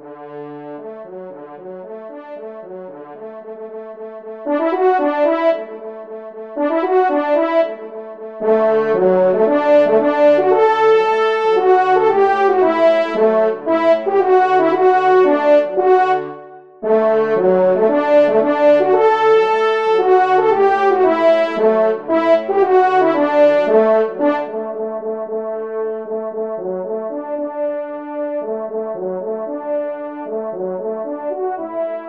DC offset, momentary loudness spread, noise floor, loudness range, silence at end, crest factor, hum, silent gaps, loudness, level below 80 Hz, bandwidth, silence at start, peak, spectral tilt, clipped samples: 0.2%; 19 LU; -37 dBFS; 10 LU; 0 s; 14 dB; none; none; -15 LUFS; -68 dBFS; 7.4 kHz; 0 s; -2 dBFS; -6.5 dB/octave; under 0.1%